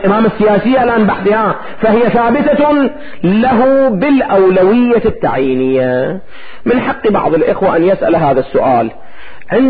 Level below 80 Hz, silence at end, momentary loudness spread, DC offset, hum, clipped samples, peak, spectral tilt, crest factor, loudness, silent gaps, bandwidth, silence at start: -40 dBFS; 0 s; 6 LU; under 0.1%; none; under 0.1%; -2 dBFS; -12.5 dB/octave; 8 dB; -11 LUFS; none; 4.9 kHz; 0 s